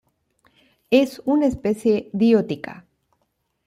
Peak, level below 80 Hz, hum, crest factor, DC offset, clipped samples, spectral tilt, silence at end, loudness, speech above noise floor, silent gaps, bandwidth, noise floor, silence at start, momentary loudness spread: -2 dBFS; -54 dBFS; none; 20 dB; under 0.1%; under 0.1%; -6.5 dB/octave; 0.95 s; -20 LUFS; 53 dB; none; 15 kHz; -72 dBFS; 0.9 s; 11 LU